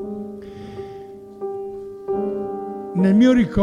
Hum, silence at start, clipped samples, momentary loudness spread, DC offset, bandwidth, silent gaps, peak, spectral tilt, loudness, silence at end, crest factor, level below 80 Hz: none; 0 s; under 0.1%; 21 LU; under 0.1%; 9.4 kHz; none; -4 dBFS; -8 dB/octave; -20 LUFS; 0 s; 16 dB; -44 dBFS